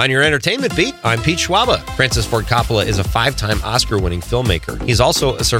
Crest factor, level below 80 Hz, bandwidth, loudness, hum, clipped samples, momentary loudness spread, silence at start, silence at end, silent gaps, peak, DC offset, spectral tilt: 16 dB; -28 dBFS; 17 kHz; -16 LUFS; none; under 0.1%; 5 LU; 0 s; 0 s; none; 0 dBFS; under 0.1%; -4 dB/octave